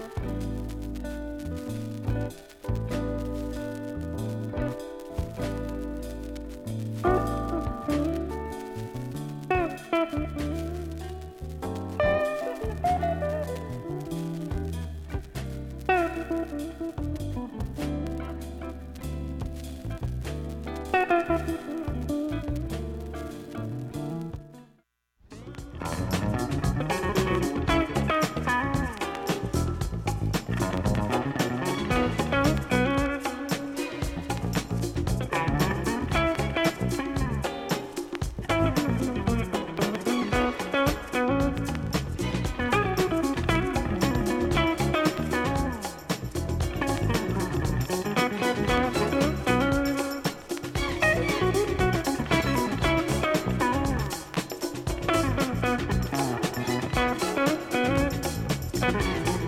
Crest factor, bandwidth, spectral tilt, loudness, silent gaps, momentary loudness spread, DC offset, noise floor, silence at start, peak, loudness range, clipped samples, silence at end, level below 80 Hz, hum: 20 dB; 17 kHz; -5.5 dB/octave; -28 LUFS; none; 11 LU; under 0.1%; -66 dBFS; 0 s; -8 dBFS; 7 LU; under 0.1%; 0 s; -38 dBFS; none